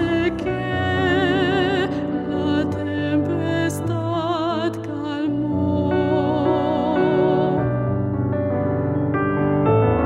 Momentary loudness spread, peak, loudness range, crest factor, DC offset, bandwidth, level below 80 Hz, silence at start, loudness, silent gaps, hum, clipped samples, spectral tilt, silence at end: 6 LU; -6 dBFS; 2 LU; 14 dB; under 0.1%; 14 kHz; -44 dBFS; 0 s; -21 LUFS; none; none; under 0.1%; -7.5 dB/octave; 0 s